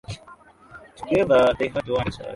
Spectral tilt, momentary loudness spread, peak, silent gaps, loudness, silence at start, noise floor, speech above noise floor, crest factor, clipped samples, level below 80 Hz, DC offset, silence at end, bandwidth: -6.5 dB/octave; 21 LU; -6 dBFS; none; -21 LUFS; 0.1 s; -49 dBFS; 28 dB; 16 dB; under 0.1%; -46 dBFS; under 0.1%; 0 s; 11.5 kHz